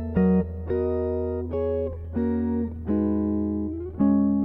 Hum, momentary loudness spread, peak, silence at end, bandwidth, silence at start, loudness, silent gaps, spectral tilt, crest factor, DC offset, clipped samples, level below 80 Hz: none; 7 LU; -10 dBFS; 0 s; 4 kHz; 0 s; -26 LUFS; none; -13 dB/octave; 14 dB; under 0.1%; under 0.1%; -38 dBFS